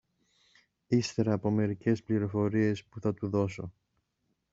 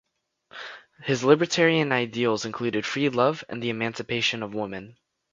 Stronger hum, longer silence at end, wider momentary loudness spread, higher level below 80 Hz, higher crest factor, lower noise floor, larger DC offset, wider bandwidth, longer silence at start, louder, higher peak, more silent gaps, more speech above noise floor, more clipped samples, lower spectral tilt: neither; first, 0.85 s vs 0.4 s; second, 7 LU vs 19 LU; about the same, -66 dBFS vs -66 dBFS; about the same, 18 dB vs 22 dB; first, -79 dBFS vs -64 dBFS; neither; about the same, 7.8 kHz vs 7.6 kHz; first, 0.9 s vs 0.55 s; second, -30 LUFS vs -24 LUFS; second, -14 dBFS vs -4 dBFS; neither; first, 50 dB vs 40 dB; neither; first, -7 dB/octave vs -4.5 dB/octave